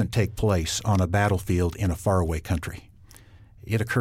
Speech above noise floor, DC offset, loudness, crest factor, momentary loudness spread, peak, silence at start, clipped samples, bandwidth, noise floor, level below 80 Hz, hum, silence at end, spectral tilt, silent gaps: 26 dB; under 0.1%; -25 LUFS; 14 dB; 7 LU; -10 dBFS; 0 s; under 0.1%; 16 kHz; -50 dBFS; -40 dBFS; none; 0 s; -5.5 dB/octave; none